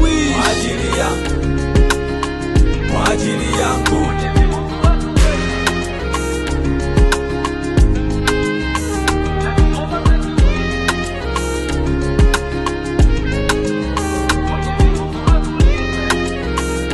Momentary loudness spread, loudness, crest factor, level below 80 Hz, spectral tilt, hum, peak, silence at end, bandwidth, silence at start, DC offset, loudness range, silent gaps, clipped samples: 4 LU; -17 LUFS; 14 dB; -18 dBFS; -5.5 dB/octave; none; 0 dBFS; 0 s; 12.5 kHz; 0 s; under 0.1%; 1 LU; none; under 0.1%